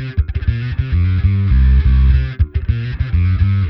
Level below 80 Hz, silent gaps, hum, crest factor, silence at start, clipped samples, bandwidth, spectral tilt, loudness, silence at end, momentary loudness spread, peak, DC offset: -16 dBFS; none; none; 12 dB; 0 s; under 0.1%; 5.4 kHz; -10 dB/octave; -16 LUFS; 0 s; 7 LU; -2 dBFS; under 0.1%